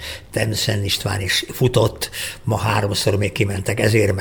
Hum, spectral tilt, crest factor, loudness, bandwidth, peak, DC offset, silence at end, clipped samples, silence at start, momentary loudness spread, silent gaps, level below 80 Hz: none; -4.5 dB/octave; 18 dB; -20 LUFS; over 20 kHz; -2 dBFS; under 0.1%; 0 s; under 0.1%; 0 s; 6 LU; none; -42 dBFS